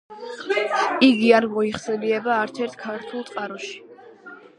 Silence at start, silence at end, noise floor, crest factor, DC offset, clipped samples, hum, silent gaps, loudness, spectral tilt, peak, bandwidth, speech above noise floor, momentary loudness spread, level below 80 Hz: 0.1 s; 0.2 s; -44 dBFS; 20 dB; under 0.1%; under 0.1%; none; none; -21 LUFS; -4.5 dB/octave; -2 dBFS; 11 kHz; 22 dB; 17 LU; -66 dBFS